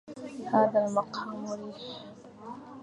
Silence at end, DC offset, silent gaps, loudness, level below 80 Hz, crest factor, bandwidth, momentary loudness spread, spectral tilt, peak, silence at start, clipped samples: 0 s; under 0.1%; none; -30 LUFS; -74 dBFS; 20 dB; 10.5 kHz; 20 LU; -6 dB/octave; -10 dBFS; 0.05 s; under 0.1%